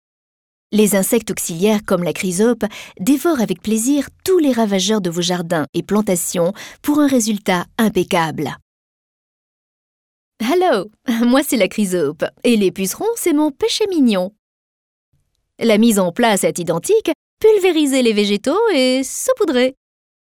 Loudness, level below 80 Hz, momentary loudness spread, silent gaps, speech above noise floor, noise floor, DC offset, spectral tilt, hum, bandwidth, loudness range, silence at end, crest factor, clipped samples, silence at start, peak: -17 LUFS; -54 dBFS; 6 LU; 5.69-5.73 s, 8.62-10.32 s, 14.39-15.12 s, 17.15-17.37 s; over 74 dB; under -90 dBFS; under 0.1%; -4.5 dB/octave; none; 18.5 kHz; 4 LU; 0.65 s; 14 dB; under 0.1%; 0.7 s; -2 dBFS